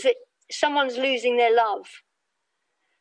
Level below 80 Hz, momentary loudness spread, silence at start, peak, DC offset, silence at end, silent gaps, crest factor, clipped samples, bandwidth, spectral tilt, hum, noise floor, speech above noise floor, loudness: -84 dBFS; 13 LU; 0 s; -8 dBFS; under 0.1%; 1.05 s; none; 18 dB; under 0.1%; 10 kHz; -1 dB/octave; none; -78 dBFS; 56 dB; -23 LUFS